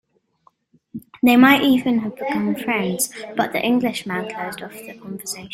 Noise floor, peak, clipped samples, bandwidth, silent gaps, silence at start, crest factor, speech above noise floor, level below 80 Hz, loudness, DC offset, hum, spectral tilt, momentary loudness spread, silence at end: -60 dBFS; -2 dBFS; under 0.1%; 16.5 kHz; none; 0.95 s; 18 dB; 41 dB; -60 dBFS; -19 LUFS; under 0.1%; none; -4 dB/octave; 21 LU; 0 s